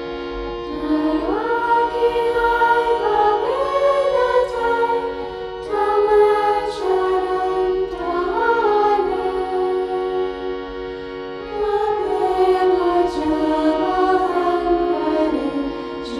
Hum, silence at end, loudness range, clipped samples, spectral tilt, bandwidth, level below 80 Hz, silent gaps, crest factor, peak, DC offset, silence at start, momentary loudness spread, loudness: none; 0 s; 3 LU; under 0.1%; -5.5 dB/octave; 11.5 kHz; -42 dBFS; none; 14 dB; -4 dBFS; under 0.1%; 0 s; 11 LU; -19 LUFS